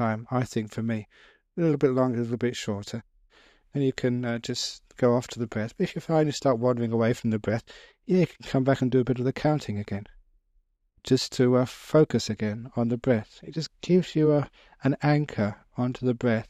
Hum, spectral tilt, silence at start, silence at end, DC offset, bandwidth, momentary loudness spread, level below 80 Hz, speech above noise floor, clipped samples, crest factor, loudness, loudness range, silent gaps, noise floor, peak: none; -6.5 dB/octave; 0 s; 0.05 s; under 0.1%; 14 kHz; 10 LU; -58 dBFS; 42 dB; under 0.1%; 18 dB; -26 LUFS; 3 LU; none; -68 dBFS; -8 dBFS